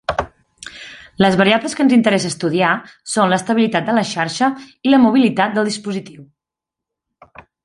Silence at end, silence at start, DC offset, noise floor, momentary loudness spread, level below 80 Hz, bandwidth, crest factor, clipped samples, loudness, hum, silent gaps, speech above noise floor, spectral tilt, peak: 1.4 s; 0.1 s; under 0.1%; -85 dBFS; 20 LU; -50 dBFS; 11.5 kHz; 16 dB; under 0.1%; -16 LUFS; none; none; 70 dB; -5 dB/octave; 0 dBFS